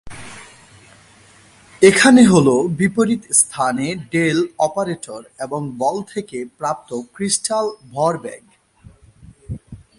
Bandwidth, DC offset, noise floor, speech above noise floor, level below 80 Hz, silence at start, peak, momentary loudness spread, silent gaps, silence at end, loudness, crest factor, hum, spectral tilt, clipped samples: 11.5 kHz; under 0.1%; -48 dBFS; 31 dB; -50 dBFS; 0.05 s; 0 dBFS; 23 LU; none; 0.2 s; -17 LUFS; 18 dB; none; -4 dB/octave; under 0.1%